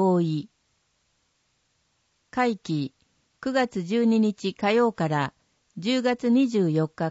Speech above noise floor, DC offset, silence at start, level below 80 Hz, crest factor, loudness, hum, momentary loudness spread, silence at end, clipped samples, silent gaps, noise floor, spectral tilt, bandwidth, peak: 47 dB; under 0.1%; 0 s; -68 dBFS; 16 dB; -25 LUFS; none; 11 LU; 0 s; under 0.1%; none; -71 dBFS; -6.5 dB/octave; 8 kHz; -10 dBFS